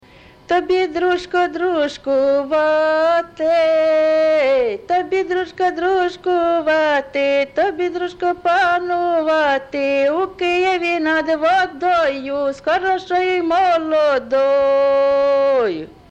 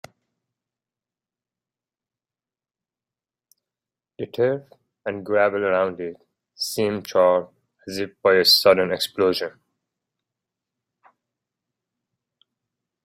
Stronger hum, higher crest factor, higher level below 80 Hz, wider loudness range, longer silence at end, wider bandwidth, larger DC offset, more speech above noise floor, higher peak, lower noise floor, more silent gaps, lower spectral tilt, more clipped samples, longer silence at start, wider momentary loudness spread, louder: neither; second, 10 dB vs 22 dB; first, -52 dBFS vs -70 dBFS; second, 2 LU vs 12 LU; second, 0.25 s vs 3.55 s; second, 8.6 kHz vs 16 kHz; neither; second, 27 dB vs over 69 dB; second, -8 dBFS vs -4 dBFS; second, -44 dBFS vs under -90 dBFS; neither; about the same, -4.5 dB/octave vs -3.5 dB/octave; neither; second, 0.5 s vs 4.2 s; second, 5 LU vs 19 LU; first, -17 LUFS vs -20 LUFS